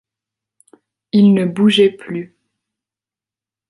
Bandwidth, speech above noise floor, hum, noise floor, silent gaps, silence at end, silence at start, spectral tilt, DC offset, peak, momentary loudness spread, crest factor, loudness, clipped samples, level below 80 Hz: 11.5 kHz; 77 dB; none; -90 dBFS; none; 1.45 s; 1.15 s; -7 dB/octave; under 0.1%; -2 dBFS; 15 LU; 16 dB; -13 LUFS; under 0.1%; -64 dBFS